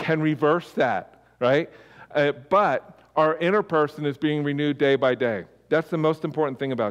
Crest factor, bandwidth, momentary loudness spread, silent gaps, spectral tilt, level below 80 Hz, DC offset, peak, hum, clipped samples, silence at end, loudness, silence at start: 14 dB; 12.5 kHz; 6 LU; none; -7.5 dB/octave; -68 dBFS; under 0.1%; -10 dBFS; none; under 0.1%; 0 s; -24 LUFS; 0 s